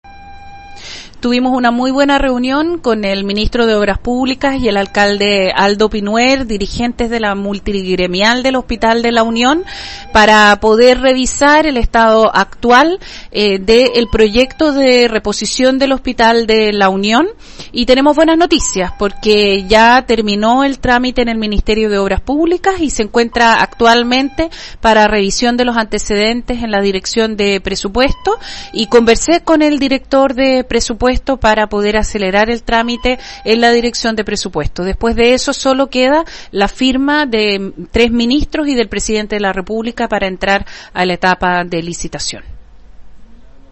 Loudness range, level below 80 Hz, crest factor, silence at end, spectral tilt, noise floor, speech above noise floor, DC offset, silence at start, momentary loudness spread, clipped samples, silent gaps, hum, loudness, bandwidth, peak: 5 LU; -30 dBFS; 12 dB; 0.15 s; -4 dB/octave; -35 dBFS; 23 dB; under 0.1%; 0.05 s; 9 LU; 0.1%; none; none; -12 LUFS; 8.6 kHz; 0 dBFS